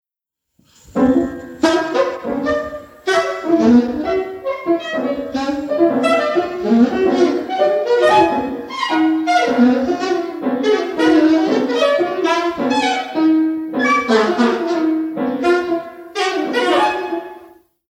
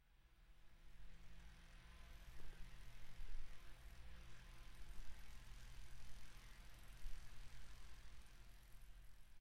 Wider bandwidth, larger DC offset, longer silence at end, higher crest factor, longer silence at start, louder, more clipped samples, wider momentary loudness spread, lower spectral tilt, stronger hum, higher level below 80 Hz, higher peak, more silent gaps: second, 12 kHz vs 15.5 kHz; neither; first, 0.45 s vs 0 s; about the same, 16 dB vs 16 dB; first, 0.95 s vs 0.05 s; first, -16 LUFS vs -64 LUFS; neither; first, 9 LU vs 6 LU; about the same, -4.5 dB/octave vs -3.5 dB/octave; neither; first, -52 dBFS vs -58 dBFS; first, -2 dBFS vs -36 dBFS; neither